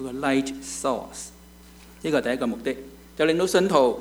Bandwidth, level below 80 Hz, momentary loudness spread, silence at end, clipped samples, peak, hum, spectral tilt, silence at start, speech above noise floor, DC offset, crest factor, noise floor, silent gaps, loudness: over 20 kHz; -52 dBFS; 17 LU; 0 s; under 0.1%; -6 dBFS; none; -4.5 dB/octave; 0 s; 24 dB; under 0.1%; 20 dB; -48 dBFS; none; -24 LUFS